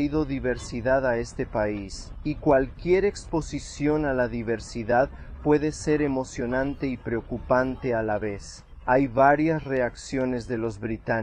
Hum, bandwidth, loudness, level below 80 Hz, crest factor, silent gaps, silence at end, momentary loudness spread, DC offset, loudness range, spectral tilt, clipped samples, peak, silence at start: none; 10 kHz; -26 LUFS; -42 dBFS; 20 dB; none; 0 s; 8 LU; under 0.1%; 2 LU; -6.5 dB/octave; under 0.1%; -6 dBFS; 0 s